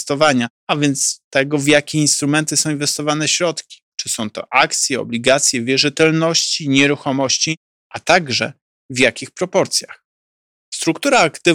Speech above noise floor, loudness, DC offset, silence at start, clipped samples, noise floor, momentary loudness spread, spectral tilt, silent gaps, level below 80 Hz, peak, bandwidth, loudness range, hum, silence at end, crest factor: over 73 dB; -16 LUFS; under 0.1%; 0 s; under 0.1%; under -90 dBFS; 9 LU; -3 dB/octave; 0.50-0.67 s, 1.24-1.31 s, 3.82-3.92 s, 7.57-7.90 s, 8.61-8.89 s, 10.05-10.72 s; -58 dBFS; 0 dBFS; 18 kHz; 4 LU; none; 0 s; 16 dB